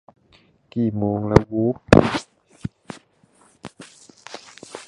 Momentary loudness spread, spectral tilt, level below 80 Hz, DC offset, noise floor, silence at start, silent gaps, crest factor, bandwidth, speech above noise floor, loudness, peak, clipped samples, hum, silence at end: 26 LU; -7 dB/octave; -40 dBFS; under 0.1%; -57 dBFS; 0.75 s; none; 22 dB; 11.5 kHz; 40 dB; -19 LUFS; 0 dBFS; under 0.1%; none; 0.05 s